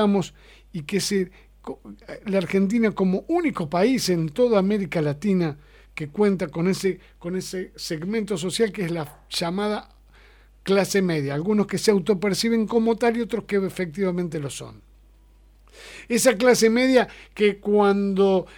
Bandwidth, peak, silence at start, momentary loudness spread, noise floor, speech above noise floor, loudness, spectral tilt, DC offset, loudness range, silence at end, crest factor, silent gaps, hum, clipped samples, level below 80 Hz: 19 kHz; -4 dBFS; 0 s; 16 LU; -53 dBFS; 30 dB; -23 LUFS; -5 dB/octave; under 0.1%; 5 LU; 0.05 s; 20 dB; none; 50 Hz at -50 dBFS; under 0.1%; -52 dBFS